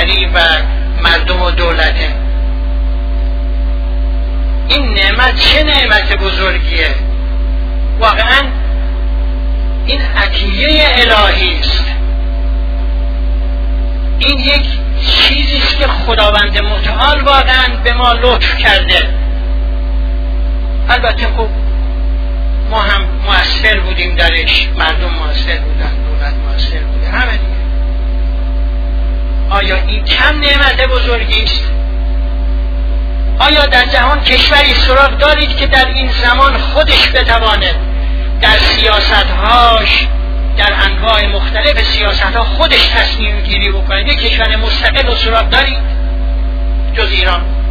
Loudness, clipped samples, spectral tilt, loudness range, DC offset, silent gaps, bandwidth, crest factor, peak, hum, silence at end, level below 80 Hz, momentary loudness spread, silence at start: -11 LUFS; 0.4%; -5.5 dB/octave; 6 LU; under 0.1%; none; 5.4 kHz; 10 dB; 0 dBFS; none; 0 s; -12 dBFS; 10 LU; 0 s